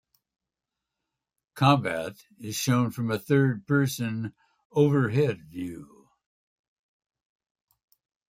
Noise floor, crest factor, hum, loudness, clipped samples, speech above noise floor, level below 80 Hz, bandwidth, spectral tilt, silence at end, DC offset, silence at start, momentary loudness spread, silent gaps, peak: -87 dBFS; 22 dB; none; -26 LUFS; under 0.1%; 62 dB; -66 dBFS; 16 kHz; -6 dB/octave; 2.45 s; under 0.1%; 1.55 s; 15 LU; 4.65-4.70 s; -6 dBFS